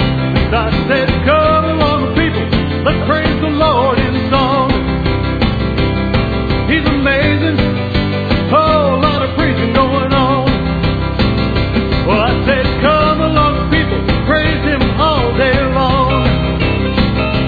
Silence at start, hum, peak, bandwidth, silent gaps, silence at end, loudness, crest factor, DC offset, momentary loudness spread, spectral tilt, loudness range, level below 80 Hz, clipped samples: 0 s; none; 0 dBFS; 4.9 kHz; none; 0 s; -13 LUFS; 12 dB; under 0.1%; 4 LU; -9 dB/octave; 1 LU; -22 dBFS; under 0.1%